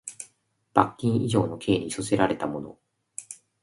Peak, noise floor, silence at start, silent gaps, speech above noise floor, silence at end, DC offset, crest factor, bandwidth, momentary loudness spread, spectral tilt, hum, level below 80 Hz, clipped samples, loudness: 0 dBFS; -65 dBFS; 0.05 s; none; 40 dB; 0.3 s; under 0.1%; 26 dB; 11.5 kHz; 19 LU; -5.5 dB/octave; none; -56 dBFS; under 0.1%; -26 LUFS